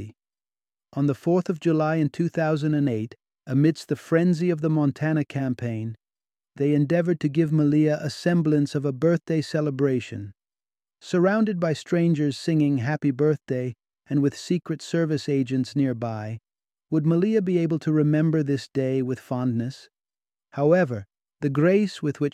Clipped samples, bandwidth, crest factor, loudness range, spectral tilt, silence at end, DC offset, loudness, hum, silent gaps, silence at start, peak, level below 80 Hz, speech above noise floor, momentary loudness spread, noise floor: under 0.1%; 10.5 kHz; 16 dB; 2 LU; -8 dB/octave; 0.05 s; under 0.1%; -24 LUFS; none; none; 0 s; -8 dBFS; -66 dBFS; over 67 dB; 9 LU; under -90 dBFS